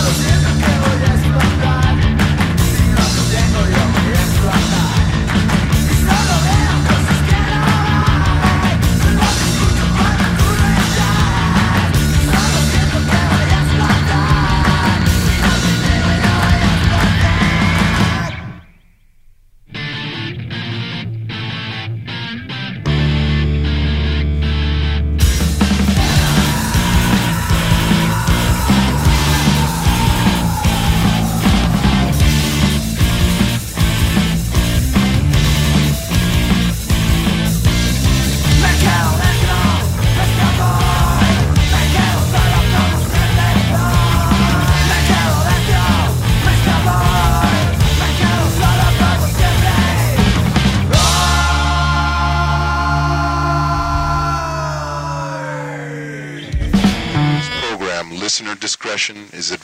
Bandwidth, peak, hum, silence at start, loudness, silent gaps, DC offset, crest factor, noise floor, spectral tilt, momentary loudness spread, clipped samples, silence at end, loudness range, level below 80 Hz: 16.5 kHz; 0 dBFS; none; 0 s; -14 LUFS; none; under 0.1%; 12 dB; -48 dBFS; -5 dB/octave; 8 LU; under 0.1%; 0.05 s; 6 LU; -20 dBFS